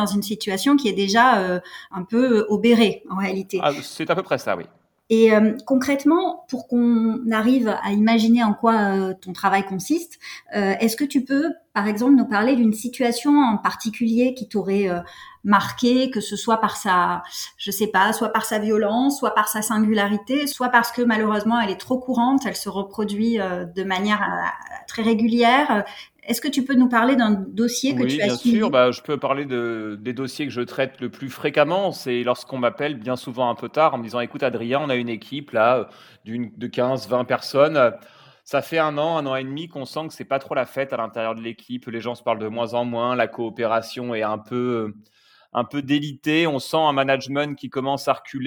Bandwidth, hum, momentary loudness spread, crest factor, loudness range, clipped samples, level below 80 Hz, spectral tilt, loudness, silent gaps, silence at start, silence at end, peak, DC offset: 19 kHz; none; 11 LU; 18 dB; 5 LU; under 0.1%; -64 dBFS; -5 dB/octave; -21 LUFS; none; 0 s; 0 s; -2 dBFS; under 0.1%